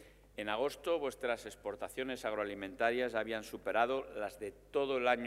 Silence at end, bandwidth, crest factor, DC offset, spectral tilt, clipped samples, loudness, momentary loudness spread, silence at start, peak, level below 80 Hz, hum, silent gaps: 0 s; 16 kHz; 22 dB; under 0.1%; -4 dB/octave; under 0.1%; -37 LUFS; 10 LU; 0 s; -16 dBFS; -64 dBFS; 50 Hz at -65 dBFS; none